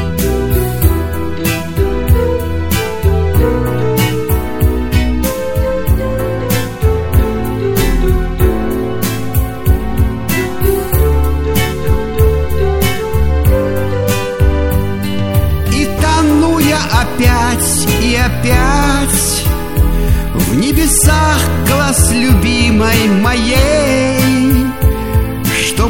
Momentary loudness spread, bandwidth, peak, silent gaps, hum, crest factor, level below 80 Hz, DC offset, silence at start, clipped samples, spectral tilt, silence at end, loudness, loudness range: 6 LU; 17 kHz; 0 dBFS; none; none; 12 dB; -18 dBFS; 1%; 0 s; under 0.1%; -5 dB/octave; 0 s; -13 LUFS; 4 LU